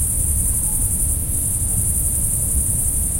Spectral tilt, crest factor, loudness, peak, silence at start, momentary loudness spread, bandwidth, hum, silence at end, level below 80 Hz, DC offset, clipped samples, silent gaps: -4 dB/octave; 14 dB; -17 LUFS; -6 dBFS; 0 s; 1 LU; 16.5 kHz; none; 0 s; -26 dBFS; under 0.1%; under 0.1%; none